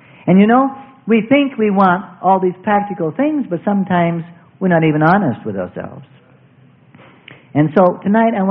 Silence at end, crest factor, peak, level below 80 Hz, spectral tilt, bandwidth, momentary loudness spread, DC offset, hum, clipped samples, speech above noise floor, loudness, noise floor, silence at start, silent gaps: 0 s; 16 dB; 0 dBFS; -58 dBFS; -11 dB/octave; 4.6 kHz; 12 LU; under 0.1%; none; under 0.1%; 34 dB; -15 LUFS; -48 dBFS; 0.25 s; none